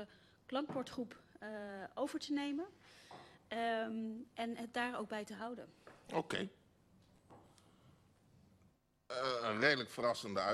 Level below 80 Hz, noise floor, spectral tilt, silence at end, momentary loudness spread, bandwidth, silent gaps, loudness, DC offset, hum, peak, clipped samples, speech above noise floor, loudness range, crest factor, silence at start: -78 dBFS; -73 dBFS; -4.5 dB/octave; 0 s; 18 LU; 13 kHz; none; -41 LUFS; under 0.1%; none; -18 dBFS; under 0.1%; 32 dB; 8 LU; 24 dB; 0 s